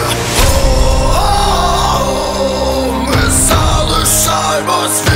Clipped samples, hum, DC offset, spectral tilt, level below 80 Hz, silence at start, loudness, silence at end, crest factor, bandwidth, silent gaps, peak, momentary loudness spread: under 0.1%; none; under 0.1%; -3.5 dB/octave; -16 dBFS; 0 s; -12 LUFS; 0 s; 12 dB; 16.5 kHz; none; 0 dBFS; 5 LU